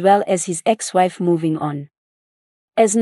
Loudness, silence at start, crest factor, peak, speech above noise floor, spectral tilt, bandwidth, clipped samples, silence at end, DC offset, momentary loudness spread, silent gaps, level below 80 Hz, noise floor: -19 LUFS; 0 s; 18 dB; -2 dBFS; over 72 dB; -5 dB/octave; 12 kHz; under 0.1%; 0 s; under 0.1%; 9 LU; 1.98-2.68 s; -70 dBFS; under -90 dBFS